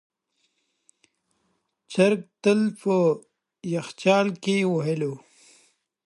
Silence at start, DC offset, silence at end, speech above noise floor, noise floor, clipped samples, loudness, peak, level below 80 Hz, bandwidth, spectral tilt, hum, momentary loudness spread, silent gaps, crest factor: 1.9 s; under 0.1%; 0.9 s; 50 dB; -73 dBFS; under 0.1%; -24 LUFS; -4 dBFS; -74 dBFS; 11.5 kHz; -6 dB/octave; none; 10 LU; none; 22 dB